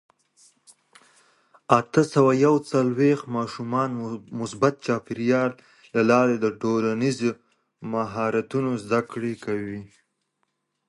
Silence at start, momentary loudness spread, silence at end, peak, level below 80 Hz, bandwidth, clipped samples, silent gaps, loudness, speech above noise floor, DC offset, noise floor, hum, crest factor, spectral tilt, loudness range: 1.7 s; 12 LU; 1.05 s; -2 dBFS; -66 dBFS; 11.5 kHz; under 0.1%; none; -24 LUFS; 52 dB; under 0.1%; -75 dBFS; none; 22 dB; -6.5 dB/octave; 5 LU